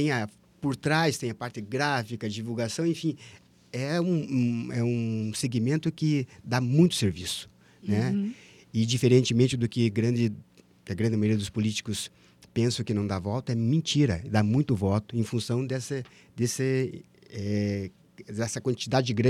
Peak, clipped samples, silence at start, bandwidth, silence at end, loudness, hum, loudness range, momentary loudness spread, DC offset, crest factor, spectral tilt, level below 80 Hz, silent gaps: -8 dBFS; under 0.1%; 0 s; 14.5 kHz; 0 s; -28 LUFS; none; 4 LU; 11 LU; under 0.1%; 20 dB; -6 dB/octave; -60 dBFS; none